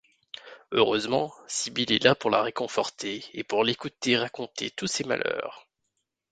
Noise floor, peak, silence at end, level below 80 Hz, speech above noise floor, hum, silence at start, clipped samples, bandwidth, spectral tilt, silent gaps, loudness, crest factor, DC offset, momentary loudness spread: -80 dBFS; -4 dBFS; 0.7 s; -66 dBFS; 53 dB; none; 0.45 s; under 0.1%; 9.4 kHz; -3 dB/octave; none; -27 LUFS; 24 dB; under 0.1%; 13 LU